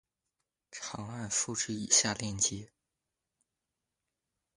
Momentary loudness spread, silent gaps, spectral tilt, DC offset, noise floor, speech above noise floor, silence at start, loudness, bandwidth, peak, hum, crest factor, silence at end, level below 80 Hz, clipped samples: 17 LU; none; -1.5 dB/octave; under 0.1%; -88 dBFS; 55 dB; 0.7 s; -30 LUFS; 11.5 kHz; -12 dBFS; none; 26 dB; 1.9 s; -64 dBFS; under 0.1%